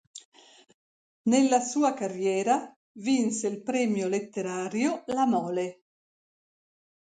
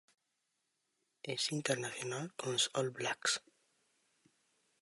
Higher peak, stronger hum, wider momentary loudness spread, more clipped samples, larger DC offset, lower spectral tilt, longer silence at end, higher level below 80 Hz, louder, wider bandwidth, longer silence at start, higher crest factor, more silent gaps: first, -10 dBFS vs -18 dBFS; neither; about the same, 9 LU vs 8 LU; neither; neither; first, -4.5 dB/octave vs -2.5 dB/octave; about the same, 1.45 s vs 1.45 s; first, -76 dBFS vs -86 dBFS; first, -27 LUFS vs -37 LUFS; second, 9.6 kHz vs 11.5 kHz; second, 0.15 s vs 1.25 s; about the same, 18 dB vs 22 dB; first, 0.25-0.32 s, 0.74-1.24 s, 2.76-2.95 s vs none